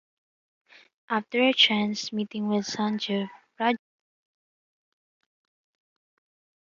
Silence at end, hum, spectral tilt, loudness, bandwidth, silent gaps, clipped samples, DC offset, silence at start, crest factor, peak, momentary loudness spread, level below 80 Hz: 2.85 s; none; -4 dB/octave; -25 LUFS; 7.6 kHz; none; under 0.1%; under 0.1%; 1.1 s; 22 dB; -8 dBFS; 12 LU; -78 dBFS